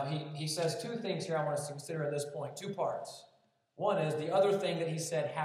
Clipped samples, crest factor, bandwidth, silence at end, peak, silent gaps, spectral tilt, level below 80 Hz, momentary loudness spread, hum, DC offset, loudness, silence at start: under 0.1%; 16 dB; 14.5 kHz; 0 s; -18 dBFS; none; -5 dB/octave; under -90 dBFS; 10 LU; none; under 0.1%; -35 LUFS; 0 s